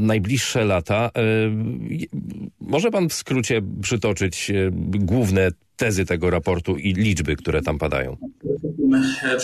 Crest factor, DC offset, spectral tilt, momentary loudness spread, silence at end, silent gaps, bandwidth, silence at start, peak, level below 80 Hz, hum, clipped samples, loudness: 12 dB; under 0.1%; -5.5 dB/octave; 9 LU; 0 s; none; 13.5 kHz; 0 s; -8 dBFS; -42 dBFS; none; under 0.1%; -22 LUFS